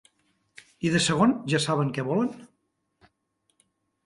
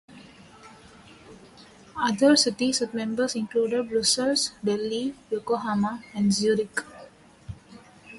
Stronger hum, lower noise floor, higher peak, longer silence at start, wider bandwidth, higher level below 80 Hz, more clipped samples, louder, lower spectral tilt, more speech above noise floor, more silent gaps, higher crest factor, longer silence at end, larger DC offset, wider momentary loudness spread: neither; first, -75 dBFS vs -50 dBFS; about the same, -10 dBFS vs -8 dBFS; first, 0.8 s vs 0.1 s; about the same, 11.5 kHz vs 11.5 kHz; about the same, -62 dBFS vs -60 dBFS; neither; about the same, -25 LUFS vs -25 LUFS; first, -5 dB/octave vs -3.5 dB/octave; first, 51 dB vs 26 dB; neither; about the same, 20 dB vs 20 dB; first, 1.6 s vs 0 s; neither; second, 10 LU vs 16 LU